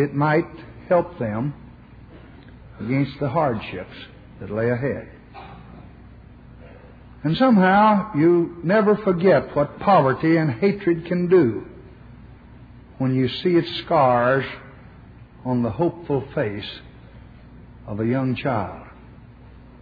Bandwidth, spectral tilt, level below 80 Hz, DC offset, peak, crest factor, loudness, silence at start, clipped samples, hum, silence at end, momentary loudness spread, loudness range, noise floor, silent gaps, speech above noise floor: 5 kHz; -10 dB/octave; -50 dBFS; under 0.1%; -6 dBFS; 16 dB; -21 LUFS; 0 s; under 0.1%; none; 0.7 s; 21 LU; 9 LU; -45 dBFS; none; 25 dB